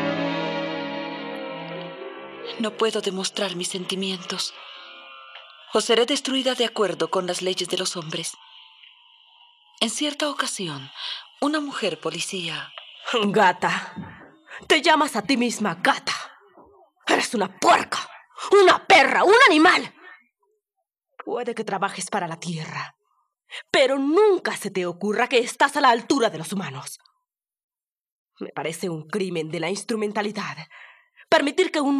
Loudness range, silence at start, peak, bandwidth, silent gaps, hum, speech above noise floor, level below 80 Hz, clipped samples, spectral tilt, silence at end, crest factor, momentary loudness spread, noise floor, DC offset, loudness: 11 LU; 0 s; -4 dBFS; 14.5 kHz; 27.64-27.69 s, 28.12-28.26 s; none; 60 dB; -72 dBFS; under 0.1%; -3 dB/octave; 0 s; 20 dB; 20 LU; -82 dBFS; under 0.1%; -22 LUFS